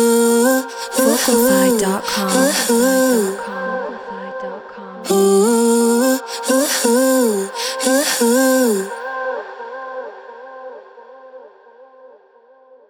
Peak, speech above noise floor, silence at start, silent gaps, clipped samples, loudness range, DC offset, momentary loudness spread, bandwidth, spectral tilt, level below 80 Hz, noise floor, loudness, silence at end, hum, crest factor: -2 dBFS; 35 dB; 0 s; none; under 0.1%; 14 LU; under 0.1%; 17 LU; over 20 kHz; -3 dB/octave; -60 dBFS; -49 dBFS; -15 LUFS; 0.85 s; none; 16 dB